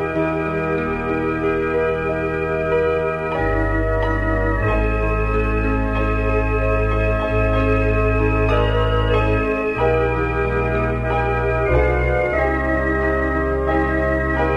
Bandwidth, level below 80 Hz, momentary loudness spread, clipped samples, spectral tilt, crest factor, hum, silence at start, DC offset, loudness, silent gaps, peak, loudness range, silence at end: 6.2 kHz; -24 dBFS; 3 LU; under 0.1%; -8.5 dB/octave; 14 dB; none; 0 s; under 0.1%; -19 LUFS; none; -4 dBFS; 2 LU; 0 s